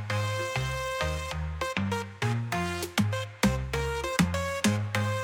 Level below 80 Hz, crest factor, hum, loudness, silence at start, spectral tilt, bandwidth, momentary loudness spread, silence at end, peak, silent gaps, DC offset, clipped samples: -42 dBFS; 20 dB; none; -29 LUFS; 0 s; -5 dB/octave; 18.5 kHz; 4 LU; 0 s; -10 dBFS; none; under 0.1%; under 0.1%